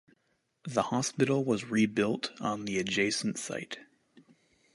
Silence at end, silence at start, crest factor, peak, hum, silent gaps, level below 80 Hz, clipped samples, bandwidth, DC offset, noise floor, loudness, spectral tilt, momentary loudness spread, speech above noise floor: 0.55 s; 0.65 s; 20 dB; -12 dBFS; none; none; -68 dBFS; under 0.1%; 11.5 kHz; under 0.1%; -76 dBFS; -31 LUFS; -4.5 dB/octave; 10 LU; 45 dB